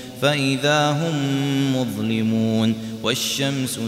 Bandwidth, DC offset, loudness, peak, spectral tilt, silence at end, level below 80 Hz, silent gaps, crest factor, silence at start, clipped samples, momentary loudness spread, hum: 16 kHz; under 0.1%; -21 LUFS; -6 dBFS; -4.5 dB/octave; 0 s; -58 dBFS; none; 14 dB; 0 s; under 0.1%; 5 LU; none